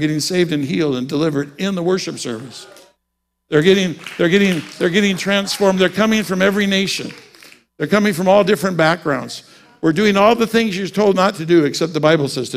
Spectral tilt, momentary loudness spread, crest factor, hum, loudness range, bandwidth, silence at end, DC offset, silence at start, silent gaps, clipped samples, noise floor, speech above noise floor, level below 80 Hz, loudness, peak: -5 dB/octave; 10 LU; 16 dB; none; 4 LU; 16 kHz; 0 s; under 0.1%; 0 s; none; under 0.1%; -74 dBFS; 57 dB; -54 dBFS; -16 LUFS; 0 dBFS